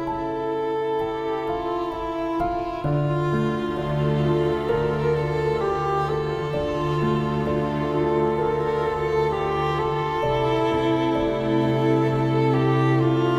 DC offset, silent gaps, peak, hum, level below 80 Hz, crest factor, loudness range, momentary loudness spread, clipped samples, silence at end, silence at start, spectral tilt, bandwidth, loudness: under 0.1%; none; -8 dBFS; none; -44 dBFS; 14 dB; 3 LU; 6 LU; under 0.1%; 0 s; 0 s; -8 dB/octave; 11 kHz; -23 LUFS